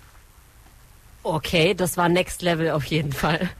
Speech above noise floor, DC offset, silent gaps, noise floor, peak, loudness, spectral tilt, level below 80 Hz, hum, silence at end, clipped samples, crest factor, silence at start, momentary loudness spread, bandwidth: 28 dB; under 0.1%; none; -50 dBFS; -8 dBFS; -22 LUFS; -5 dB/octave; -44 dBFS; none; 0 s; under 0.1%; 16 dB; 1.25 s; 7 LU; 14.5 kHz